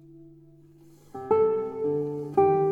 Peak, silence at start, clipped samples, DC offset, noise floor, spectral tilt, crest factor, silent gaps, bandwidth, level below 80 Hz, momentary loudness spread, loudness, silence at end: -10 dBFS; 0.15 s; under 0.1%; under 0.1%; -53 dBFS; -10 dB/octave; 16 dB; none; 3.3 kHz; -66 dBFS; 13 LU; -25 LUFS; 0 s